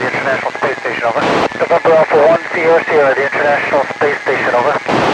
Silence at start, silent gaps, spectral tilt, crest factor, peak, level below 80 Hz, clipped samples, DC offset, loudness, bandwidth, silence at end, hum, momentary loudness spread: 0 s; none; -5 dB/octave; 12 dB; 0 dBFS; -54 dBFS; under 0.1%; under 0.1%; -13 LUFS; 10.5 kHz; 0 s; none; 6 LU